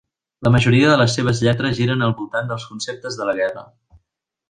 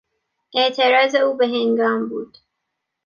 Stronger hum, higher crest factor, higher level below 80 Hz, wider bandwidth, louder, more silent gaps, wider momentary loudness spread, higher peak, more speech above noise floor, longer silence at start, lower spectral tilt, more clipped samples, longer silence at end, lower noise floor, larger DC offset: neither; about the same, 18 dB vs 16 dB; first, -46 dBFS vs -74 dBFS; first, 9.6 kHz vs 7 kHz; about the same, -18 LUFS vs -18 LUFS; neither; first, 14 LU vs 10 LU; about the same, -2 dBFS vs -4 dBFS; about the same, 57 dB vs 60 dB; second, 0.4 s vs 0.55 s; first, -6 dB/octave vs -4 dB/octave; neither; about the same, 0.85 s vs 0.8 s; about the same, -75 dBFS vs -78 dBFS; neither